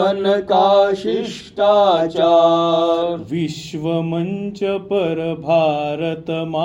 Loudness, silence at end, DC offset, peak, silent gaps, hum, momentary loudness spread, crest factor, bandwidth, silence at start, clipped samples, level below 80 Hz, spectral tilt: -17 LUFS; 0 s; under 0.1%; -2 dBFS; none; none; 10 LU; 14 dB; 10.5 kHz; 0 s; under 0.1%; -56 dBFS; -6.5 dB/octave